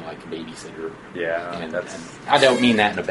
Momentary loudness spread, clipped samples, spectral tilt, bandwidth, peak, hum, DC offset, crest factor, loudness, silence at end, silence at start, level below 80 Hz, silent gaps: 18 LU; under 0.1%; -4 dB/octave; 11.5 kHz; 0 dBFS; none; under 0.1%; 22 dB; -20 LUFS; 0 s; 0 s; -56 dBFS; none